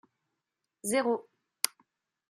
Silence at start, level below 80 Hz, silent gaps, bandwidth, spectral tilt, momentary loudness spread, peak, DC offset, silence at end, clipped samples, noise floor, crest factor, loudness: 0.85 s; -80 dBFS; none; 13.5 kHz; -2 dB/octave; 7 LU; -2 dBFS; under 0.1%; 0.6 s; under 0.1%; -86 dBFS; 34 dB; -32 LUFS